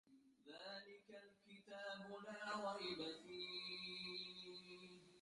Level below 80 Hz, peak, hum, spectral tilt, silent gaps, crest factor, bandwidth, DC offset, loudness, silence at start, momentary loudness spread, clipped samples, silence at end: -88 dBFS; -36 dBFS; none; -3.5 dB/octave; none; 18 dB; 11.5 kHz; under 0.1%; -51 LUFS; 0.05 s; 16 LU; under 0.1%; 0 s